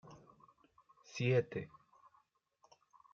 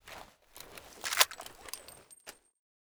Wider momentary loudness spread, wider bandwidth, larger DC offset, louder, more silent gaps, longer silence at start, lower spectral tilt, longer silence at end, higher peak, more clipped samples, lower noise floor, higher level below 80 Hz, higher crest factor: about the same, 26 LU vs 24 LU; second, 7.2 kHz vs over 20 kHz; neither; second, -37 LUFS vs -31 LUFS; neither; about the same, 0.05 s vs 0.05 s; first, -6 dB/octave vs 1.5 dB/octave; first, 1.45 s vs 0.55 s; second, -22 dBFS vs -6 dBFS; neither; first, -75 dBFS vs -55 dBFS; second, -80 dBFS vs -68 dBFS; second, 22 dB vs 34 dB